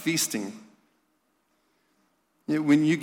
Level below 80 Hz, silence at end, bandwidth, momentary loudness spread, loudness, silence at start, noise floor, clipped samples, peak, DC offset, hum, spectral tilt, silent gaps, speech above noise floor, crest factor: -76 dBFS; 0 s; 17 kHz; 20 LU; -25 LUFS; 0 s; -72 dBFS; under 0.1%; -12 dBFS; under 0.1%; none; -4 dB/octave; none; 47 dB; 16 dB